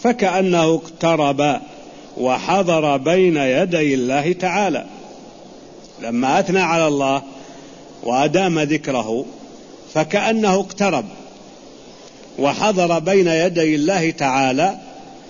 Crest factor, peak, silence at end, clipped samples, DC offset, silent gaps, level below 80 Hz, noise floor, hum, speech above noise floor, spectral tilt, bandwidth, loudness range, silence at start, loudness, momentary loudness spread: 14 dB; -4 dBFS; 0 s; under 0.1%; 0.1%; none; -56 dBFS; -41 dBFS; none; 24 dB; -5 dB/octave; 7.4 kHz; 3 LU; 0 s; -18 LUFS; 19 LU